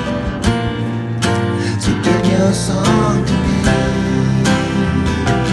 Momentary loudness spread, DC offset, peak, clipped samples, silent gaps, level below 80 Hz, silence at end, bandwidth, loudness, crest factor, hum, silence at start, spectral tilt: 5 LU; under 0.1%; 0 dBFS; under 0.1%; none; -28 dBFS; 0 s; 12.5 kHz; -16 LUFS; 14 dB; none; 0 s; -6 dB/octave